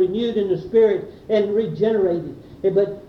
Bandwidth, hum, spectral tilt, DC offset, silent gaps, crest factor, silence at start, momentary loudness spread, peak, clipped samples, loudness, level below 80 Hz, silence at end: 6.2 kHz; none; -8.5 dB/octave; under 0.1%; none; 14 dB; 0 s; 8 LU; -6 dBFS; under 0.1%; -20 LUFS; -54 dBFS; 0 s